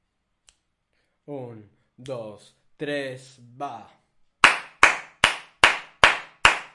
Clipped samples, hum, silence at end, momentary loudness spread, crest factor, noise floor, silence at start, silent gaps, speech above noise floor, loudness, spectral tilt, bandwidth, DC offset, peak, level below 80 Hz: under 0.1%; none; 0.1 s; 20 LU; 26 dB; -73 dBFS; 1.3 s; none; 38 dB; -20 LUFS; -1.5 dB/octave; 11.5 kHz; under 0.1%; 0 dBFS; -52 dBFS